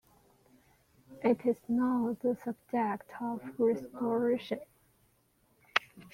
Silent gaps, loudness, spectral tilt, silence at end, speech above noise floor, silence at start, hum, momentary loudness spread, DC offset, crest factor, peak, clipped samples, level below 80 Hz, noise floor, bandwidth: none; -33 LUFS; -6 dB/octave; 0.05 s; 39 dB; 1.1 s; none; 8 LU; under 0.1%; 26 dB; -8 dBFS; under 0.1%; -74 dBFS; -70 dBFS; 15.5 kHz